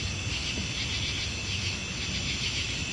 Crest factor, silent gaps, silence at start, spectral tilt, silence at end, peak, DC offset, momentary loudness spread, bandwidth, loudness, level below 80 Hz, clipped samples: 14 dB; none; 0 s; -2.5 dB/octave; 0 s; -16 dBFS; under 0.1%; 2 LU; 11.5 kHz; -30 LUFS; -42 dBFS; under 0.1%